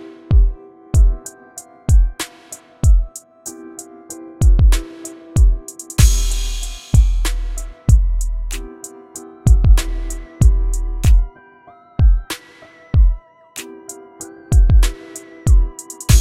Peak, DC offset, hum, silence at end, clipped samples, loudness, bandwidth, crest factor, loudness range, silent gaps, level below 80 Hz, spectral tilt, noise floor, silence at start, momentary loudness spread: 0 dBFS; under 0.1%; none; 0 s; under 0.1%; -18 LUFS; 15 kHz; 16 dB; 3 LU; none; -16 dBFS; -5 dB/octave; -45 dBFS; 0 s; 19 LU